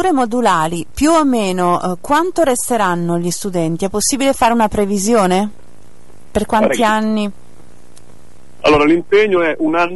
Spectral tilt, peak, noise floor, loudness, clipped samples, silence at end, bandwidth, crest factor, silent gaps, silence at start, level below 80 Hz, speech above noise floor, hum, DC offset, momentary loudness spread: -4.5 dB/octave; -2 dBFS; -46 dBFS; -15 LUFS; under 0.1%; 0 s; 12 kHz; 14 dB; none; 0 s; -40 dBFS; 31 dB; none; 4%; 7 LU